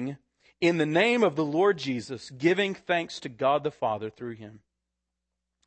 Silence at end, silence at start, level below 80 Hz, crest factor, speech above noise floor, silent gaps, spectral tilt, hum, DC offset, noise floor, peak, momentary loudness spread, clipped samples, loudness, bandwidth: 1.1 s; 0 s; -72 dBFS; 18 dB; 58 dB; none; -5.5 dB/octave; none; under 0.1%; -84 dBFS; -10 dBFS; 16 LU; under 0.1%; -26 LUFS; 8.8 kHz